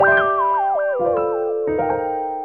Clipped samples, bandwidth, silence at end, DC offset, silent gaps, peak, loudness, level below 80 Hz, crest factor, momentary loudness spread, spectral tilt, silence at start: under 0.1%; 4.3 kHz; 0 s; 0.2%; none; -4 dBFS; -19 LUFS; -52 dBFS; 16 dB; 6 LU; -8.5 dB/octave; 0 s